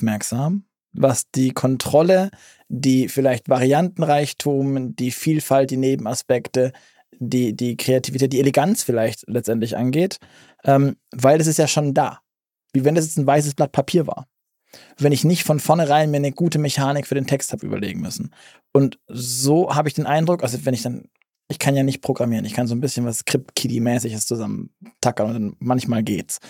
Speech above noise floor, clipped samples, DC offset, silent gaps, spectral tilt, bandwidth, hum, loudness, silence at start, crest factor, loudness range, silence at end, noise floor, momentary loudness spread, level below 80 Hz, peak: 58 dB; under 0.1%; under 0.1%; none; -5.5 dB/octave; 17 kHz; none; -20 LUFS; 0 s; 18 dB; 4 LU; 0 s; -77 dBFS; 8 LU; -62 dBFS; -2 dBFS